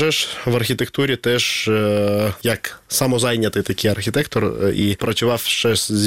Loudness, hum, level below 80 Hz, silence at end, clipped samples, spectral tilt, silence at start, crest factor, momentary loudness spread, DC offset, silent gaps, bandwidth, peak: -19 LUFS; none; -48 dBFS; 0 s; under 0.1%; -4 dB/octave; 0 s; 16 dB; 3 LU; 0.3%; none; 16.5 kHz; -2 dBFS